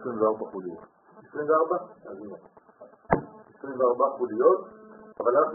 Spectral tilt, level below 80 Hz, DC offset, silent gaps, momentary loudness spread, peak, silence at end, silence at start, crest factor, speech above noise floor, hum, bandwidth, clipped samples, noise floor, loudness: -2.5 dB/octave; -60 dBFS; under 0.1%; none; 22 LU; -6 dBFS; 0 s; 0 s; 22 dB; 26 dB; none; 2.5 kHz; under 0.1%; -52 dBFS; -26 LUFS